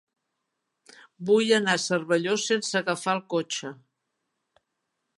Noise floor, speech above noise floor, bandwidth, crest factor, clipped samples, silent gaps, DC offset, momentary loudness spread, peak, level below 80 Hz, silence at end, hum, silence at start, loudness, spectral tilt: -81 dBFS; 56 dB; 11.5 kHz; 22 dB; under 0.1%; none; under 0.1%; 11 LU; -6 dBFS; -80 dBFS; 1.45 s; none; 1.2 s; -25 LUFS; -3.5 dB/octave